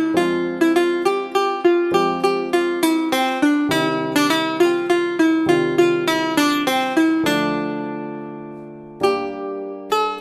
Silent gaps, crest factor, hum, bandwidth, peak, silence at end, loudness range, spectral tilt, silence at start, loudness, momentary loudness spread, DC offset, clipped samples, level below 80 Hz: none; 16 dB; none; 15.5 kHz; -2 dBFS; 0 s; 4 LU; -4.5 dB/octave; 0 s; -19 LUFS; 11 LU; under 0.1%; under 0.1%; -58 dBFS